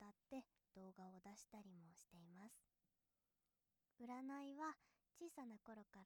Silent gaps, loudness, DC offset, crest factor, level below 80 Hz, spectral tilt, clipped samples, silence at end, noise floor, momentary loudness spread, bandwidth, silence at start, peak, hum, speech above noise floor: none; -59 LUFS; under 0.1%; 20 dB; under -90 dBFS; -5 dB/octave; under 0.1%; 0 s; under -90 dBFS; 13 LU; 19.5 kHz; 0 s; -40 dBFS; none; over 32 dB